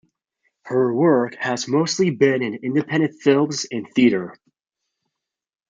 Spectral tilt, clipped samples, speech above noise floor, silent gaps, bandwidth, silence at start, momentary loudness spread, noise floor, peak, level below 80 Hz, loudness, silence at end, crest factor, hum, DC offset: -5.5 dB/octave; under 0.1%; 62 dB; none; 9.4 kHz; 0.65 s; 7 LU; -81 dBFS; -4 dBFS; -68 dBFS; -20 LUFS; 1.35 s; 18 dB; none; under 0.1%